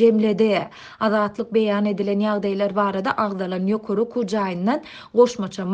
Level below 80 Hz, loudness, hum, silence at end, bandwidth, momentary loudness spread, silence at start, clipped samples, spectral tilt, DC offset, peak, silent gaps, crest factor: -62 dBFS; -21 LUFS; none; 0 s; 8.4 kHz; 6 LU; 0 s; under 0.1%; -6.5 dB/octave; under 0.1%; -4 dBFS; none; 16 dB